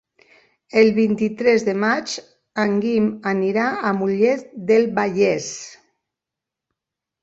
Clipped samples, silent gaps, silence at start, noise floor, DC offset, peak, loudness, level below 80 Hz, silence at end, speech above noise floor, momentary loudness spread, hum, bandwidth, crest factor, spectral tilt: under 0.1%; none; 0.75 s; -86 dBFS; under 0.1%; -2 dBFS; -19 LUFS; -62 dBFS; 1.5 s; 67 dB; 12 LU; none; 8 kHz; 18 dB; -5.5 dB/octave